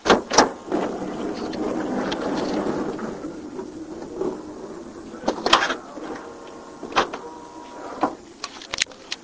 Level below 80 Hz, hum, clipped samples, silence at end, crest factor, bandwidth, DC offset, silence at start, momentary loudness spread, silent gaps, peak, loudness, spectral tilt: -52 dBFS; none; under 0.1%; 0 s; 26 dB; 8 kHz; under 0.1%; 0 s; 19 LU; none; 0 dBFS; -25 LUFS; -3 dB/octave